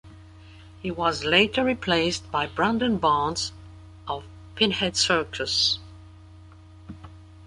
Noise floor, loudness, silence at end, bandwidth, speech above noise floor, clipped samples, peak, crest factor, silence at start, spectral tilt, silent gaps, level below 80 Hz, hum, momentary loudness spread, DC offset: -47 dBFS; -24 LUFS; 0 s; 11.5 kHz; 23 dB; under 0.1%; -4 dBFS; 22 dB; 0.05 s; -3.5 dB/octave; none; -48 dBFS; none; 19 LU; under 0.1%